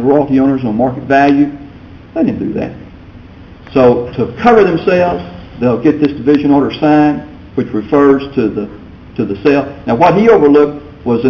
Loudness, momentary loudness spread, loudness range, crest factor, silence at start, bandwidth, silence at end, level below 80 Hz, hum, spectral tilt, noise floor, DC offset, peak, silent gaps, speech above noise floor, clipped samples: -12 LUFS; 14 LU; 3 LU; 12 dB; 0 s; 6.8 kHz; 0 s; -38 dBFS; none; -8.5 dB/octave; -34 dBFS; under 0.1%; 0 dBFS; none; 24 dB; under 0.1%